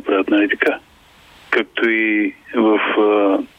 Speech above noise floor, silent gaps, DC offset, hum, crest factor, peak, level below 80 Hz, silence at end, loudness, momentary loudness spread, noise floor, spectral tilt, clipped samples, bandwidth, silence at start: 31 dB; none; under 0.1%; none; 16 dB; -2 dBFS; -60 dBFS; 0.1 s; -17 LUFS; 5 LU; -47 dBFS; -5.5 dB/octave; under 0.1%; 5.8 kHz; 0.05 s